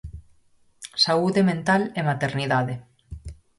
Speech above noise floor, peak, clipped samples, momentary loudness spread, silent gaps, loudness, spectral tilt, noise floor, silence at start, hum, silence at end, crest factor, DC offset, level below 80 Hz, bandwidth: 37 dB; -8 dBFS; under 0.1%; 22 LU; none; -22 LUFS; -5.5 dB/octave; -59 dBFS; 0.05 s; none; 0.25 s; 18 dB; under 0.1%; -48 dBFS; 11.5 kHz